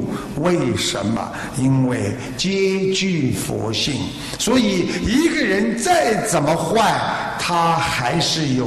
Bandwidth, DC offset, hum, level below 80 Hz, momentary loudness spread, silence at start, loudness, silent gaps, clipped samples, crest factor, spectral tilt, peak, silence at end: 13 kHz; under 0.1%; none; -42 dBFS; 6 LU; 0 s; -19 LUFS; none; under 0.1%; 14 dB; -4.5 dB/octave; -4 dBFS; 0 s